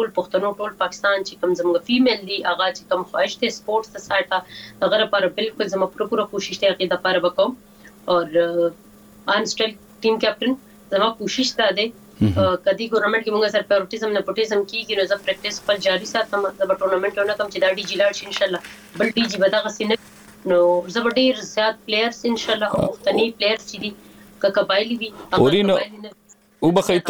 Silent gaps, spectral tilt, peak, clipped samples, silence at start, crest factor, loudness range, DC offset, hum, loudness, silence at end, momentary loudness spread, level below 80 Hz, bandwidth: none; -4.5 dB/octave; -2 dBFS; under 0.1%; 0 s; 18 dB; 2 LU; under 0.1%; none; -21 LUFS; 0 s; 7 LU; -54 dBFS; over 20 kHz